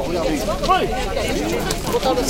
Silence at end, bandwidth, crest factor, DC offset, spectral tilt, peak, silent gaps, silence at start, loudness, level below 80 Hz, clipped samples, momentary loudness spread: 0 s; 17 kHz; 18 dB; under 0.1%; -4 dB/octave; -2 dBFS; none; 0 s; -20 LUFS; -30 dBFS; under 0.1%; 4 LU